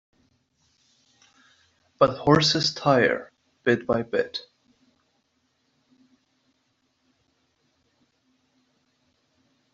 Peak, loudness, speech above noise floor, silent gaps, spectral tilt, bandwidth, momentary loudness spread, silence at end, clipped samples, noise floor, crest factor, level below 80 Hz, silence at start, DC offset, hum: -4 dBFS; -23 LUFS; 50 dB; none; -3.5 dB/octave; 8 kHz; 11 LU; 5.35 s; under 0.1%; -72 dBFS; 24 dB; -60 dBFS; 2 s; under 0.1%; none